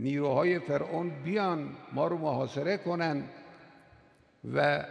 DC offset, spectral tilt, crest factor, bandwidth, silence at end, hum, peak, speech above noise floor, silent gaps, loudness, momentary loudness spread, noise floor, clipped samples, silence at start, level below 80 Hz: under 0.1%; -7.5 dB/octave; 18 dB; 9.8 kHz; 0 s; none; -12 dBFS; 31 dB; none; -31 LUFS; 9 LU; -61 dBFS; under 0.1%; 0 s; -72 dBFS